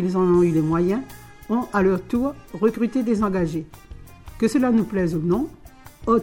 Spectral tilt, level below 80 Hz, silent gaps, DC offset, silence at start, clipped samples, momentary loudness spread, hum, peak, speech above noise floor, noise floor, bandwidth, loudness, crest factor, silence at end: -8 dB/octave; -44 dBFS; none; under 0.1%; 0 s; under 0.1%; 12 LU; none; -6 dBFS; 20 dB; -40 dBFS; 17 kHz; -22 LUFS; 16 dB; 0 s